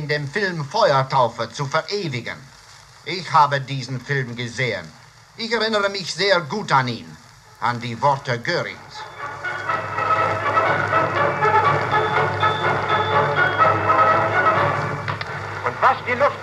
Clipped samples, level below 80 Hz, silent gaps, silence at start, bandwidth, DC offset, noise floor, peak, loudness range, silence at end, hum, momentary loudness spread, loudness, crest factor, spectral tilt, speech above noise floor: under 0.1%; -58 dBFS; none; 0 s; 13 kHz; under 0.1%; -45 dBFS; -2 dBFS; 6 LU; 0 s; none; 11 LU; -20 LUFS; 18 dB; -5 dB/octave; 24 dB